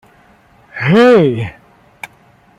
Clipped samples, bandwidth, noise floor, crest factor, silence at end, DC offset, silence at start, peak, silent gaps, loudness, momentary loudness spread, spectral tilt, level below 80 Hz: under 0.1%; 12 kHz; -48 dBFS; 14 dB; 0.5 s; under 0.1%; 0.75 s; -2 dBFS; none; -11 LUFS; 25 LU; -7.5 dB/octave; -52 dBFS